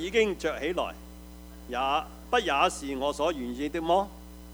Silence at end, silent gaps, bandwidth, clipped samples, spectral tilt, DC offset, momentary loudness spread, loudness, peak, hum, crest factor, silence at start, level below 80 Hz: 0 s; none; over 20 kHz; under 0.1%; -4 dB/octave; under 0.1%; 21 LU; -29 LUFS; -8 dBFS; none; 20 dB; 0 s; -48 dBFS